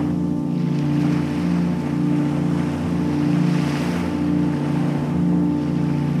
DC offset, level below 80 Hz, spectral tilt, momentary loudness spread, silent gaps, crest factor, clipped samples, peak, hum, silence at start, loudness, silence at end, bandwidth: under 0.1%; -46 dBFS; -8 dB/octave; 3 LU; none; 12 dB; under 0.1%; -8 dBFS; none; 0 s; -21 LUFS; 0 s; 11.5 kHz